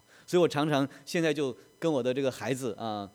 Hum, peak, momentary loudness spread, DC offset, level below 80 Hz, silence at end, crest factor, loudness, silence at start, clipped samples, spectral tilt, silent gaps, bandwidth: none; -12 dBFS; 8 LU; under 0.1%; -76 dBFS; 0.05 s; 18 dB; -30 LUFS; 0.3 s; under 0.1%; -5.5 dB/octave; none; 17 kHz